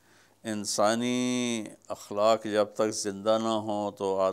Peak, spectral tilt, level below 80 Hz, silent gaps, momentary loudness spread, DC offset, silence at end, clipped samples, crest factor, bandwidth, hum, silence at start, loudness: -12 dBFS; -4 dB/octave; -80 dBFS; none; 11 LU; under 0.1%; 0 s; under 0.1%; 18 dB; 16 kHz; none; 0.45 s; -28 LUFS